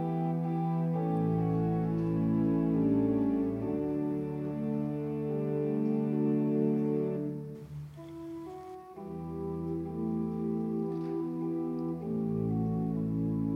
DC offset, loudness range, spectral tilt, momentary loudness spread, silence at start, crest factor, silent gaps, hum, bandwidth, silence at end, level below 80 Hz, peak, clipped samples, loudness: under 0.1%; 7 LU; -11 dB/octave; 14 LU; 0 s; 14 dB; none; none; 4.9 kHz; 0 s; -58 dBFS; -18 dBFS; under 0.1%; -32 LUFS